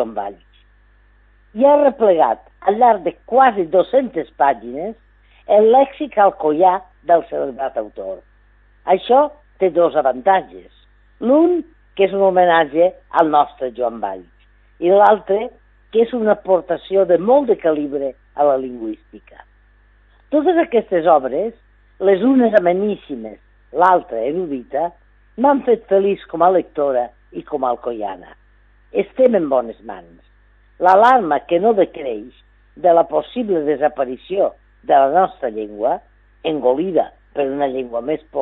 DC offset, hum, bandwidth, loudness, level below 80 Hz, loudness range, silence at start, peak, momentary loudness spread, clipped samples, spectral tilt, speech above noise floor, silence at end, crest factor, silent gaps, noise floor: under 0.1%; 50 Hz at -50 dBFS; 4.8 kHz; -17 LUFS; -52 dBFS; 4 LU; 0 s; 0 dBFS; 14 LU; under 0.1%; -8 dB/octave; 36 dB; 0 s; 18 dB; none; -52 dBFS